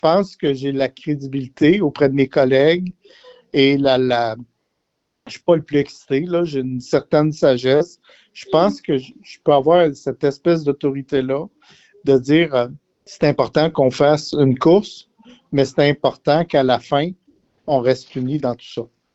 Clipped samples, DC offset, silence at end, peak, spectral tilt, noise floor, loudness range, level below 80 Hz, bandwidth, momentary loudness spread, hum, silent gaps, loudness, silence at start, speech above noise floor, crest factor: under 0.1%; under 0.1%; 0.3 s; -2 dBFS; -7 dB/octave; -74 dBFS; 3 LU; -54 dBFS; 8 kHz; 10 LU; none; none; -18 LUFS; 0.05 s; 56 dB; 16 dB